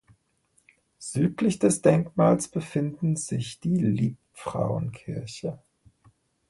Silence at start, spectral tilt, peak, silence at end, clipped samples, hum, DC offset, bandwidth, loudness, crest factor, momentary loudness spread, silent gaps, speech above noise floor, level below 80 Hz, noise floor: 1 s; -6.5 dB/octave; -6 dBFS; 0.95 s; under 0.1%; none; under 0.1%; 12 kHz; -26 LUFS; 20 dB; 14 LU; none; 44 dB; -58 dBFS; -69 dBFS